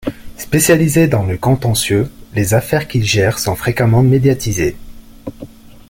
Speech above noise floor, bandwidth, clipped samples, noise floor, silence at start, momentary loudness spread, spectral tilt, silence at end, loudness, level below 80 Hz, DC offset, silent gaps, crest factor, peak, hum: 22 dB; 17 kHz; under 0.1%; -35 dBFS; 0 s; 15 LU; -5.5 dB/octave; 0.45 s; -14 LUFS; -36 dBFS; under 0.1%; none; 14 dB; 0 dBFS; none